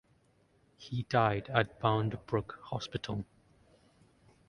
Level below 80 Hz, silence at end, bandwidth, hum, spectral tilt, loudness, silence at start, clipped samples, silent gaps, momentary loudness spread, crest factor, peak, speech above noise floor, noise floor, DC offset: -60 dBFS; 1.25 s; 10 kHz; none; -6.5 dB/octave; -33 LUFS; 0.8 s; under 0.1%; none; 12 LU; 26 dB; -10 dBFS; 36 dB; -69 dBFS; under 0.1%